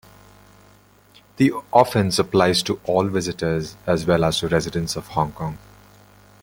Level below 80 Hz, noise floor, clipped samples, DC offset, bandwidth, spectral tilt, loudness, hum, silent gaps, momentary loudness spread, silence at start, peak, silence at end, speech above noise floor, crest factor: -48 dBFS; -53 dBFS; under 0.1%; under 0.1%; 17 kHz; -5 dB/octave; -21 LUFS; 50 Hz at -40 dBFS; none; 9 LU; 1.4 s; -2 dBFS; 0.85 s; 32 dB; 20 dB